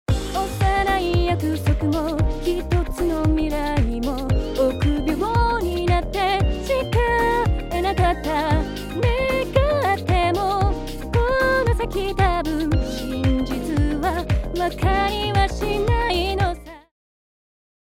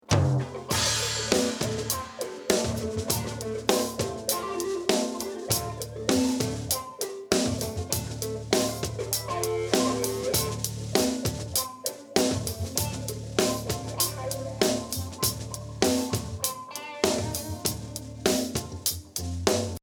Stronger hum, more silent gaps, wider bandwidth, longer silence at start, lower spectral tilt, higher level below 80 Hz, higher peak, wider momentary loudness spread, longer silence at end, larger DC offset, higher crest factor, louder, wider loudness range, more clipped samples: neither; neither; second, 16.5 kHz vs over 20 kHz; about the same, 0.1 s vs 0.1 s; first, -6.5 dB/octave vs -3.5 dB/octave; first, -28 dBFS vs -48 dBFS; about the same, -4 dBFS vs -6 dBFS; second, 4 LU vs 8 LU; first, 1.2 s vs 0.05 s; neither; about the same, 18 dB vs 22 dB; first, -21 LUFS vs -28 LUFS; about the same, 2 LU vs 2 LU; neither